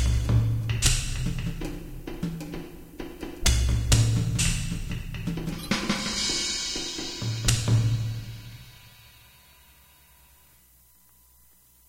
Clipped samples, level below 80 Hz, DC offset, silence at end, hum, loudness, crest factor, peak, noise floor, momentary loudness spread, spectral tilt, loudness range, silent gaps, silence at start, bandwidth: under 0.1%; -34 dBFS; under 0.1%; 3 s; 60 Hz at -50 dBFS; -27 LUFS; 22 dB; -6 dBFS; -58 dBFS; 17 LU; -4 dB/octave; 4 LU; none; 0 s; 16 kHz